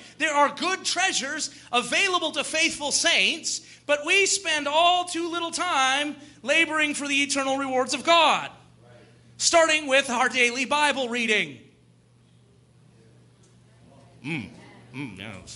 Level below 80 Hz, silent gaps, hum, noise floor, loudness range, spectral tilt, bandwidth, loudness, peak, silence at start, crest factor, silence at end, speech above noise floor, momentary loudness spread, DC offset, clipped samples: -68 dBFS; none; none; -58 dBFS; 10 LU; -1 dB/octave; 11.5 kHz; -22 LUFS; -6 dBFS; 0 s; 20 dB; 0 s; 34 dB; 13 LU; under 0.1%; under 0.1%